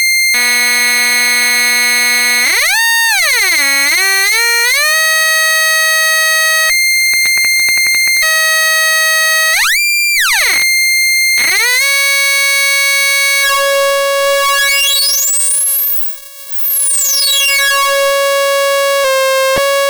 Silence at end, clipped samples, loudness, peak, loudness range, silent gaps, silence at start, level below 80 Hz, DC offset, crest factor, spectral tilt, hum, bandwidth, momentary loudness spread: 0 s; under 0.1%; -8 LUFS; -2 dBFS; 2 LU; none; 0 s; -52 dBFS; under 0.1%; 10 dB; 2.5 dB/octave; none; over 20 kHz; 3 LU